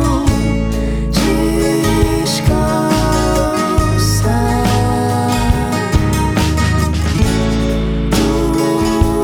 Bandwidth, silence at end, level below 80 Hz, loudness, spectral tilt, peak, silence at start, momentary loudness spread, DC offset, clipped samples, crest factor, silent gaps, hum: 19 kHz; 0 s; -20 dBFS; -15 LUFS; -5.5 dB/octave; -2 dBFS; 0 s; 2 LU; under 0.1%; under 0.1%; 12 dB; none; none